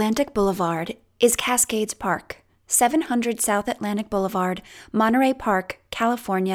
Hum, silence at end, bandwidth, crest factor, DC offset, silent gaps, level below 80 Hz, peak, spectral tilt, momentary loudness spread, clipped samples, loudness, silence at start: none; 0 s; 19.5 kHz; 18 dB; under 0.1%; none; -52 dBFS; -4 dBFS; -3.5 dB/octave; 10 LU; under 0.1%; -22 LUFS; 0 s